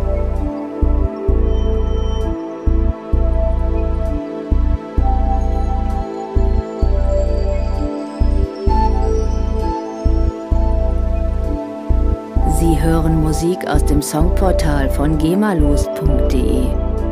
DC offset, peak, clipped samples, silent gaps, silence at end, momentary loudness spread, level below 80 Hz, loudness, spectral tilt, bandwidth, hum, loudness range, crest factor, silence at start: under 0.1%; 0 dBFS; under 0.1%; none; 0 s; 6 LU; -16 dBFS; -18 LUFS; -7 dB/octave; 14.5 kHz; none; 4 LU; 14 dB; 0 s